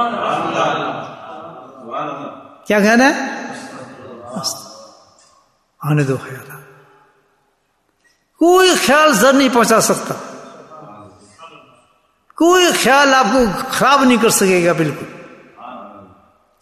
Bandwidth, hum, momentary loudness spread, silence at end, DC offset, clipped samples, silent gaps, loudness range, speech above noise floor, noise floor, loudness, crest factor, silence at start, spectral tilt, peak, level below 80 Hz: 14 kHz; none; 23 LU; 0.6 s; under 0.1%; under 0.1%; none; 11 LU; 51 dB; -64 dBFS; -13 LUFS; 16 dB; 0 s; -3.5 dB/octave; 0 dBFS; -52 dBFS